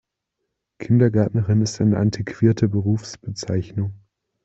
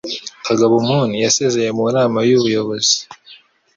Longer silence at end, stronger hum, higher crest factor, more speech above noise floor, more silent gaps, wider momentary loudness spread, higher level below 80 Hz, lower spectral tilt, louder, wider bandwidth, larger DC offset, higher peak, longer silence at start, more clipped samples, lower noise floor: about the same, 0.5 s vs 0.4 s; neither; about the same, 18 dB vs 16 dB; first, 59 dB vs 30 dB; neither; first, 12 LU vs 6 LU; first, -52 dBFS vs -58 dBFS; first, -7.5 dB/octave vs -4 dB/octave; second, -21 LUFS vs -16 LUFS; about the same, 8 kHz vs 7.8 kHz; neither; about the same, -4 dBFS vs -2 dBFS; first, 0.8 s vs 0.05 s; neither; first, -79 dBFS vs -45 dBFS